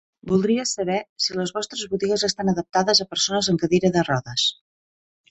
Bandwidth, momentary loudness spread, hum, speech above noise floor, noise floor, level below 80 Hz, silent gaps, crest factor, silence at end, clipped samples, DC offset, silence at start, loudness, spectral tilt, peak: 8.4 kHz; 7 LU; none; over 68 dB; under -90 dBFS; -56 dBFS; 1.09-1.16 s; 18 dB; 0.8 s; under 0.1%; under 0.1%; 0.25 s; -22 LUFS; -4 dB/octave; -6 dBFS